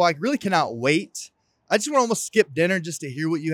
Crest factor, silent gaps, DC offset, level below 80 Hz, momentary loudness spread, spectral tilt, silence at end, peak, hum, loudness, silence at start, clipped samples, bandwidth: 18 dB; none; under 0.1%; -74 dBFS; 11 LU; -4 dB/octave; 0 s; -4 dBFS; none; -22 LUFS; 0 s; under 0.1%; 17.5 kHz